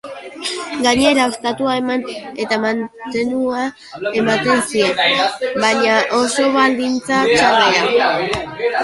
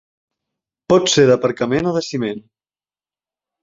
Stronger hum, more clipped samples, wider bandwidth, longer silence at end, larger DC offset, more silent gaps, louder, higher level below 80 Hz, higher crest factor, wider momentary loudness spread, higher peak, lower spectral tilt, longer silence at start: neither; neither; first, 11.5 kHz vs 8 kHz; second, 0 s vs 1.25 s; neither; neither; about the same, -16 LUFS vs -16 LUFS; about the same, -50 dBFS vs -54 dBFS; about the same, 16 dB vs 18 dB; about the same, 11 LU vs 12 LU; about the same, -2 dBFS vs -2 dBFS; second, -3 dB/octave vs -4.5 dB/octave; second, 0.05 s vs 0.9 s